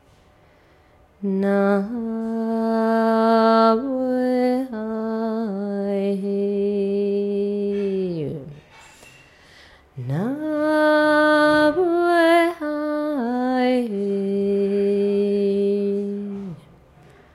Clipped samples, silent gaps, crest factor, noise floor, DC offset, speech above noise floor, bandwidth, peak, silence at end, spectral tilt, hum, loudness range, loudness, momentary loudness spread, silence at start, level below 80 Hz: under 0.1%; none; 16 dB; -54 dBFS; under 0.1%; 33 dB; 12.5 kHz; -4 dBFS; 0.8 s; -7 dB/octave; none; 7 LU; -21 LUFS; 11 LU; 1.2 s; -60 dBFS